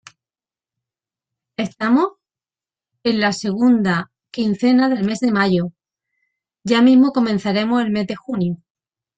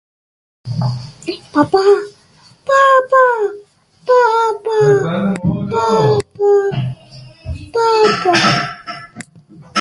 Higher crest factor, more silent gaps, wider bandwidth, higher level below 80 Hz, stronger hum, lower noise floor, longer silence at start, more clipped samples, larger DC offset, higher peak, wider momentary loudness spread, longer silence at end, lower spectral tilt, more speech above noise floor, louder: about the same, 16 dB vs 14 dB; neither; second, 8.6 kHz vs 11.5 kHz; second, -60 dBFS vs -44 dBFS; neither; first, under -90 dBFS vs -48 dBFS; first, 1.6 s vs 0.65 s; neither; neither; second, -4 dBFS vs 0 dBFS; second, 13 LU vs 18 LU; first, 0.6 s vs 0 s; about the same, -6 dB/octave vs -5.5 dB/octave; first, over 73 dB vs 35 dB; second, -18 LUFS vs -14 LUFS